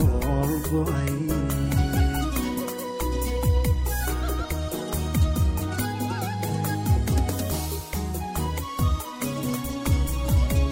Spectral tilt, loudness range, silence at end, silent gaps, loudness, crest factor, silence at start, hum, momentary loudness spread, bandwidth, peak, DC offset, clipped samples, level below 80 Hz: -6 dB/octave; 2 LU; 0 s; none; -26 LUFS; 14 dB; 0 s; none; 6 LU; 16.5 kHz; -10 dBFS; under 0.1%; under 0.1%; -28 dBFS